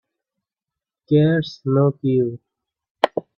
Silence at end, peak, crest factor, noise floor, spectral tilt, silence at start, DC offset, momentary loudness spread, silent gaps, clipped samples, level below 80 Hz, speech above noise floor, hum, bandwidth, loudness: 0.15 s; 0 dBFS; 20 dB; -87 dBFS; -8.5 dB/octave; 1.1 s; under 0.1%; 7 LU; 2.91-2.95 s; under 0.1%; -62 dBFS; 69 dB; none; 7 kHz; -20 LUFS